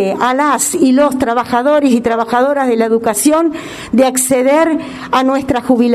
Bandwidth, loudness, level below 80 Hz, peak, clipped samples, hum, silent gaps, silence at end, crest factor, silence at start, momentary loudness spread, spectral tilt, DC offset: 14 kHz; -12 LUFS; -46 dBFS; 0 dBFS; under 0.1%; none; none; 0 s; 12 dB; 0 s; 5 LU; -3.5 dB/octave; under 0.1%